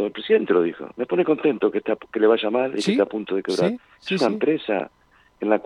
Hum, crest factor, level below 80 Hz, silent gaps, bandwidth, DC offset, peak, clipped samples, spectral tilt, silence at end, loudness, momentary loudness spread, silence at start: none; 18 dB; -66 dBFS; none; 11 kHz; under 0.1%; -4 dBFS; under 0.1%; -6 dB/octave; 0.05 s; -22 LUFS; 8 LU; 0 s